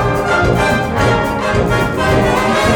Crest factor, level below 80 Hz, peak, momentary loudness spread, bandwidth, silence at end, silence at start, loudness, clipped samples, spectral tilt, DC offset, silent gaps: 12 dB; -26 dBFS; 0 dBFS; 2 LU; 19 kHz; 0 s; 0 s; -14 LUFS; under 0.1%; -5.5 dB/octave; under 0.1%; none